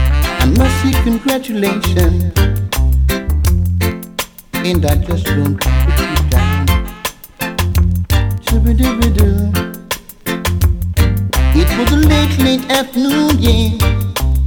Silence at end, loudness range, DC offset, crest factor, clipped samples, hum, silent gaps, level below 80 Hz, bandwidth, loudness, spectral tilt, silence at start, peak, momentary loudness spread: 0 s; 3 LU; under 0.1%; 12 dB; under 0.1%; none; none; -16 dBFS; 20 kHz; -14 LUFS; -5.5 dB/octave; 0 s; -2 dBFS; 8 LU